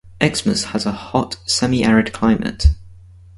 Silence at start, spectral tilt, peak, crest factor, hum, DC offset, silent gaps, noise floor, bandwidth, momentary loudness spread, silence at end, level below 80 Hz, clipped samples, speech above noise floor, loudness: 0.05 s; -5 dB/octave; 0 dBFS; 18 dB; none; under 0.1%; none; -42 dBFS; 11.5 kHz; 6 LU; 0.45 s; -26 dBFS; under 0.1%; 24 dB; -18 LUFS